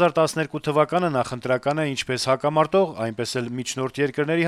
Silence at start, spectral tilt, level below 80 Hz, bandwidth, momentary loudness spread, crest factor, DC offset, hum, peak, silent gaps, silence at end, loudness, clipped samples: 0 s; -5 dB/octave; -60 dBFS; 15 kHz; 7 LU; 18 dB; under 0.1%; none; -4 dBFS; none; 0 s; -23 LUFS; under 0.1%